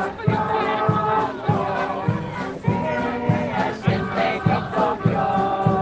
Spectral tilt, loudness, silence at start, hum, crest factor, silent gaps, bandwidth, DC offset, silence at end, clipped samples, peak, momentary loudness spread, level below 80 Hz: -8 dB/octave; -22 LUFS; 0 s; none; 18 dB; none; 8.2 kHz; under 0.1%; 0 s; under 0.1%; -4 dBFS; 4 LU; -48 dBFS